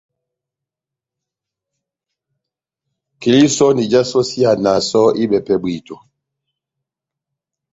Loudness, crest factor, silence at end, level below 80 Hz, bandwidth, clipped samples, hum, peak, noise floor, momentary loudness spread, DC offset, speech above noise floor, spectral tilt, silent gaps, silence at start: -14 LUFS; 18 dB; 1.75 s; -56 dBFS; 8 kHz; under 0.1%; none; -2 dBFS; -86 dBFS; 7 LU; under 0.1%; 72 dB; -5 dB/octave; none; 3.2 s